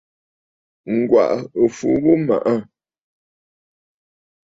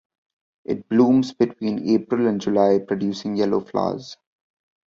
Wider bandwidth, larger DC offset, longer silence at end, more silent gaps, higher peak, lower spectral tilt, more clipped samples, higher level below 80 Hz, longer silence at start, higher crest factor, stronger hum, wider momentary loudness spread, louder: about the same, 7.8 kHz vs 7.4 kHz; neither; first, 1.85 s vs 0.75 s; neither; about the same, -2 dBFS vs -4 dBFS; about the same, -7.5 dB/octave vs -7 dB/octave; neither; about the same, -58 dBFS vs -60 dBFS; first, 0.85 s vs 0.7 s; about the same, 18 dB vs 18 dB; neither; second, 6 LU vs 12 LU; first, -18 LUFS vs -21 LUFS